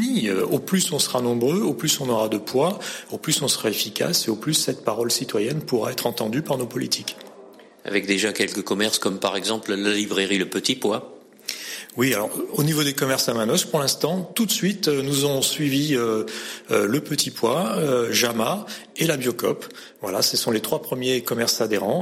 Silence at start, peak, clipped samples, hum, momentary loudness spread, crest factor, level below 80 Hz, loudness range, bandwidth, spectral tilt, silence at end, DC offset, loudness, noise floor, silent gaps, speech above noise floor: 0 s; -8 dBFS; under 0.1%; none; 6 LU; 16 dB; -66 dBFS; 3 LU; 16.5 kHz; -3.5 dB/octave; 0 s; under 0.1%; -22 LUFS; -46 dBFS; none; 23 dB